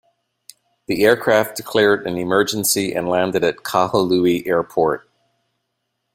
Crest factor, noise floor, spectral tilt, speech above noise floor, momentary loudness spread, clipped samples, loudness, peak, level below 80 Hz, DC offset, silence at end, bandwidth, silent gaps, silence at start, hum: 18 dB; -74 dBFS; -4 dB/octave; 57 dB; 4 LU; under 0.1%; -18 LUFS; -2 dBFS; -56 dBFS; under 0.1%; 1.15 s; 16.5 kHz; none; 0.9 s; none